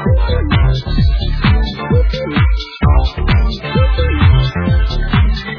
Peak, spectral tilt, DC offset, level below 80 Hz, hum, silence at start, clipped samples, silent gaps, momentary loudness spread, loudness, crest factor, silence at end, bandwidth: 0 dBFS; -8 dB/octave; under 0.1%; -14 dBFS; none; 0 s; under 0.1%; none; 4 LU; -14 LUFS; 12 dB; 0 s; 5.4 kHz